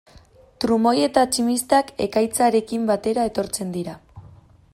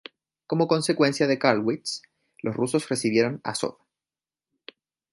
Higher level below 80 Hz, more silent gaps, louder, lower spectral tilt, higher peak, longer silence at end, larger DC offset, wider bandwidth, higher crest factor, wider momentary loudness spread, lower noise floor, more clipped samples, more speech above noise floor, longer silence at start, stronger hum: first, -54 dBFS vs -70 dBFS; neither; first, -21 LUFS vs -25 LUFS; about the same, -4 dB/octave vs -5 dB/octave; about the same, -2 dBFS vs -2 dBFS; second, 0.45 s vs 1.4 s; neither; first, 16 kHz vs 11.5 kHz; second, 18 dB vs 24 dB; about the same, 10 LU vs 11 LU; second, -50 dBFS vs under -90 dBFS; neither; second, 30 dB vs over 66 dB; second, 0.15 s vs 0.5 s; neither